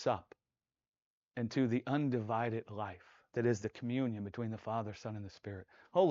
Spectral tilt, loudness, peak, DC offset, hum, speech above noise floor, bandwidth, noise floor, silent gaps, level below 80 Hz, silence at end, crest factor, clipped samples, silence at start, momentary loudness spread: -6.5 dB/octave; -38 LUFS; -16 dBFS; under 0.1%; none; over 54 dB; 7.6 kHz; under -90 dBFS; 1.06-1.28 s; -76 dBFS; 0 s; 20 dB; under 0.1%; 0 s; 13 LU